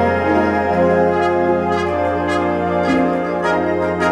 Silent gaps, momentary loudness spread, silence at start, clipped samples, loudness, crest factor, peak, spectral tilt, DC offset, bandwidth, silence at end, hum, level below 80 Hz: none; 3 LU; 0 s; under 0.1%; -17 LUFS; 12 dB; -4 dBFS; -7 dB/octave; under 0.1%; 11.5 kHz; 0 s; none; -44 dBFS